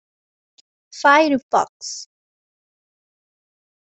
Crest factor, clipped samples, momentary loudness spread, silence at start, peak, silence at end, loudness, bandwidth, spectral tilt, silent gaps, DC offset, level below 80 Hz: 22 dB; under 0.1%; 17 LU; 0.95 s; -2 dBFS; 1.8 s; -17 LUFS; 8.4 kHz; -2.5 dB/octave; 1.43-1.49 s, 1.69-1.80 s; under 0.1%; -68 dBFS